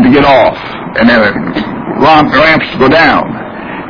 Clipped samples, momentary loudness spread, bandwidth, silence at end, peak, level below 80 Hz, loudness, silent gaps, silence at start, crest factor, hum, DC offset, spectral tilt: 1%; 13 LU; 5.4 kHz; 0 s; 0 dBFS; -34 dBFS; -7 LUFS; none; 0 s; 8 dB; none; under 0.1%; -7 dB/octave